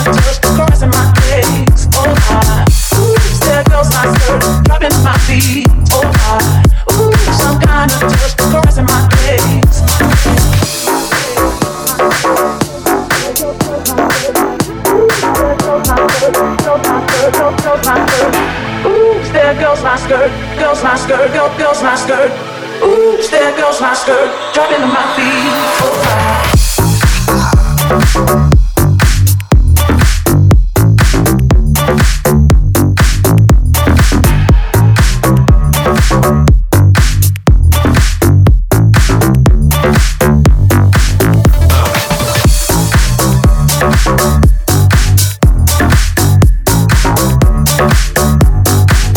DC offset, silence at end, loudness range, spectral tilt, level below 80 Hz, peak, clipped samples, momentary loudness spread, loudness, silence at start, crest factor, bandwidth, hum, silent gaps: under 0.1%; 0 s; 2 LU; -5 dB/octave; -14 dBFS; 0 dBFS; under 0.1%; 3 LU; -10 LUFS; 0 s; 8 dB; over 20 kHz; none; none